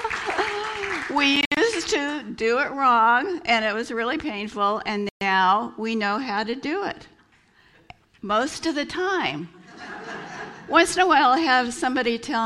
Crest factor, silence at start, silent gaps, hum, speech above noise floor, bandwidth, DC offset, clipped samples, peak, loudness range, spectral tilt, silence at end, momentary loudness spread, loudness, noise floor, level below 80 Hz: 20 dB; 0 s; 1.46-1.51 s, 5.11-5.20 s; none; 36 dB; 13 kHz; under 0.1%; under 0.1%; -4 dBFS; 7 LU; -3 dB/octave; 0 s; 17 LU; -22 LUFS; -58 dBFS; -58 dBFS